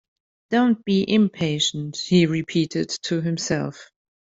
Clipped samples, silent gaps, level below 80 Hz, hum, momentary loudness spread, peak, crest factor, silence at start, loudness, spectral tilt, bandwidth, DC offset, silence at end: under 0.1%; none; -60 dBFS; none; 7 LU; -6 dBFS; 16 dB; 0.5 s; -22 LUFS; -5 dB/octave; 8 kHz; under 0.1%; 0.45 s